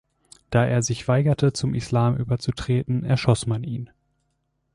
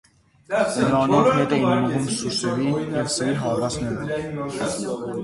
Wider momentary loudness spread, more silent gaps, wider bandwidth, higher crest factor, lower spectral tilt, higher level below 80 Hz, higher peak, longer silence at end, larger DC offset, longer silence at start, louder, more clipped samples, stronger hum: second, 7 LU vs 10 LU; neither; about the same, 11.5 kHz vs 11.5 kHz; about the same, 16 dB vs 18 dB; about the same, -6 dB/octave vs -5 dB/octave; about the same, -48 dBFS vs -52 dBFS; about the same, -6 dBFS vs -4 dBFS; first, 0.9 s vs 0 s; neither; about the same, 0.5 s vs 0.5 s; about the same, -23 LUFS vs -22 LUFS; neither; neither